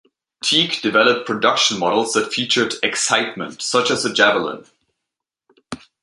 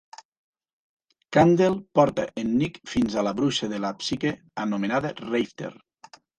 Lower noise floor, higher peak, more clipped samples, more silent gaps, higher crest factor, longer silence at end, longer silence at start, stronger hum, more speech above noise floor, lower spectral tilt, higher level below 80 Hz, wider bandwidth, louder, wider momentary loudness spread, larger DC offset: first, -83 dBFS vs -52 dBFS; first, 0 dBFS vs -6 dBFS; neither; neither; about the same, 20 dB vs 20 dB; second, 0.25 s vs 0.65 s; second, 0.45 s vs 1.3 s; neither; first, 65 dB vs 28 dB; second, -2 dB/octave vs -6 dB/octave; second, -64 dBFS vs -56 dBFS; about the same, 11.5 kHz vs 10.5 kHz; first, -17 LUFS vs -24 LUFS; about the same, 11 LU vs 10 LU; neither